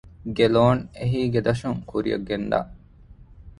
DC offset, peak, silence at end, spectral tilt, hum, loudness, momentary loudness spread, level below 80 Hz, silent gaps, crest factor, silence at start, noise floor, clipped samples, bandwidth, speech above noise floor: under 0.1%; -4 dBFS; 0.05 s; -7.5 dB/octave; none; -23 LUFS; 9 LU; -46 dBFS; none; 20 dB; 0.2 s; -48 dBFS; under 0.1%; 10.5 kHz; 26 dB